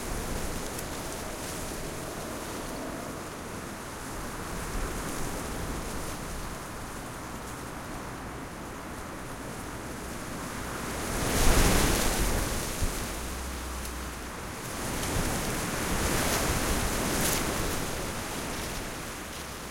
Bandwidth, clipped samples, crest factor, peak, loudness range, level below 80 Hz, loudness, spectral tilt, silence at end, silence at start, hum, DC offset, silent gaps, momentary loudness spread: 16.5 kHz; under 0.1%; 22 dB; -10 dBFS; 10 LU; -38 dBFS; -32 LUFS; -3.5 dB/octave; 0 s; 0 s; none; under 0.1%; none; 12 LU